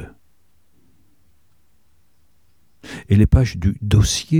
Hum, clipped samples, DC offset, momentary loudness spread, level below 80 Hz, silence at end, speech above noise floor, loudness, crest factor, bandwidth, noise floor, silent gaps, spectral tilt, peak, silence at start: none; under 0.1%; 0.3%; 22 LU; -28 dBFS; 0 s; 49 dB; -17 LUFS; 20 dB; 14 kHz; -64 dBFS; none; -5.5 dB/octave; -2 dBFS; 0 s